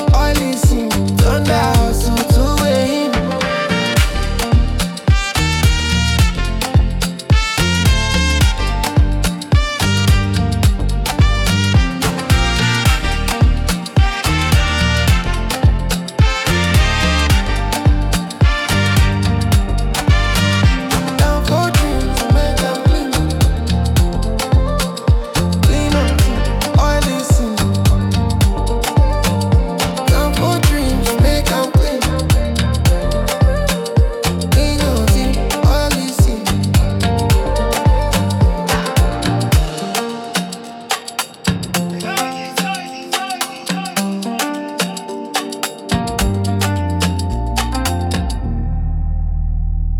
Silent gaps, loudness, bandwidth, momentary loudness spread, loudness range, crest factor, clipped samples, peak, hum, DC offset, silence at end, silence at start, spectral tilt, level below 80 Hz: none; -16 LUFS; 17.5 kHz; 6 LU; 5 LU; 14 dB; under 0.1%; 0 dBFS; none; under 0.1%; 0 s; 0 s; -5 dB/octave; -18 dBFS